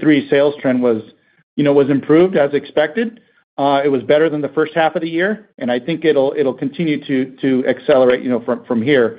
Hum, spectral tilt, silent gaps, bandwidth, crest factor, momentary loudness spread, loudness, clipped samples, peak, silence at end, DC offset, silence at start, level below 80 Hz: none; -11 dB/octave; 1.43-1.57 s, 3.44-3.57 s; 5 kHz; 14 dB; 8 LU; -16 LUFS; under 0.1%; 0 dBFS; 0 s; under 0.1%; 0 s; -62 dBFS